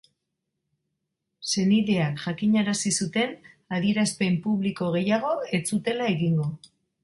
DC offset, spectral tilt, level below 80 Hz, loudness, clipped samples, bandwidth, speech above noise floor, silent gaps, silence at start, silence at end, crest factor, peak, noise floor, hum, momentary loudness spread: under 0.1%; -5 dB/octave; -64 dBFS; -25 LUFS; under 0.1%; 11.5 kHz; 57 dB; none; 1.4 s; 0.45 s; 16 dB; -10 dBFS; -81 dBFS; none; 6 LU